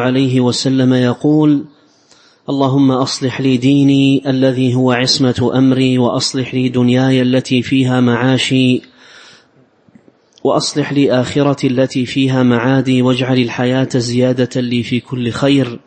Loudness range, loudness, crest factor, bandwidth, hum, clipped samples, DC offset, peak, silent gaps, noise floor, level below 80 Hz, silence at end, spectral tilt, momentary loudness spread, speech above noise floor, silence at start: 4 LU; -13 LUFS; 14 dB; 8.8 kHz; none; under 0.1%; under 0.1%; 0 dBFS; none; -50 dBFS; -52 dBFS; 0.1 s; -6 dB/octave; 5 LU; 38 dB; 0 s